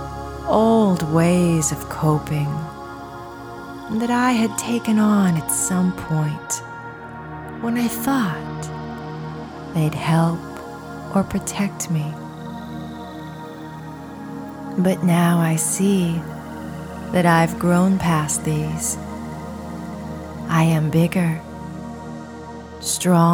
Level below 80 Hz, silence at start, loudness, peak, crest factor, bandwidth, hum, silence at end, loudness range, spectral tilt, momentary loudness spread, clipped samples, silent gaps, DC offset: -46 dBFS; 0 s; -20 LUFS; -4 dBFS; 16 dB; over 20 kHz; none; 0 s; 6 LU; -5.5 dB/octave; 17 LU; under 0.1%; none; under 0.1%